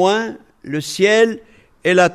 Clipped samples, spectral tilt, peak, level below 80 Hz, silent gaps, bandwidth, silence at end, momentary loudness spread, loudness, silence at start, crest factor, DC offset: under 0.1%; -4 dB/octave; -2 dBFS; -58 dBFS; none; 13.5 kHz; 0 s; 17 LU; -17 LUFS; 0 s; 16 dB; under 0.1%